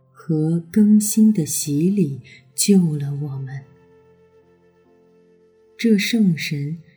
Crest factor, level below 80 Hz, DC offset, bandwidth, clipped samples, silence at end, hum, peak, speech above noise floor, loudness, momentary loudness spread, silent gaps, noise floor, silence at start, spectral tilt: 16 dB; -66 dBFS; under 0.1%; over 20 kHz; under 0.1%; 0.15 s; none; -4 dBFS; 37 dB; -19 LUFS; 15 LU; none; -55 dBFS; 0.2 s; -5.5 dB/octave